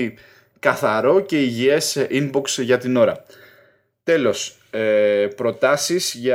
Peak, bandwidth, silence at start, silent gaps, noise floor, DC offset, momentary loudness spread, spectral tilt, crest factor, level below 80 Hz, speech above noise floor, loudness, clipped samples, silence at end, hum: -2 dBFS; 17 kHz; 0 s; none; -56 dBFS; under 0.1%; 7 LU; -4 dB/octave; 18 dB; -66 dBFS; 38 dB; -19 LUFS; under 0.1%; 0 s; none